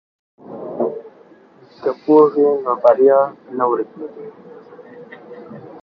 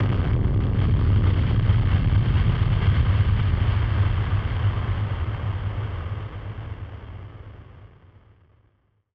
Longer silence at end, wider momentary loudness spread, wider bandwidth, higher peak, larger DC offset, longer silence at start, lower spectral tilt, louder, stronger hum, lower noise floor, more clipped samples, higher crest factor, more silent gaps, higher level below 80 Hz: second, 0.05 s vs 1.25 s; first, 25 LU vs 16 LU; first, 5.4 kHz vs 4.9 kHz; first, 0 dBFS vs -8 dBFS; second, under 0.1% vs 0.2%; first, 0.5 s vs 0 s; about the same, -9 dB/octave vs -10 dB/octave; first, -16 LUFS vs -23 LUFS; neither; second, -47 dBFS vs -64 dBFS; neither; about the same, 18 dB vs 14 dB; neither; second, -72 dBFS vs -28 dBFS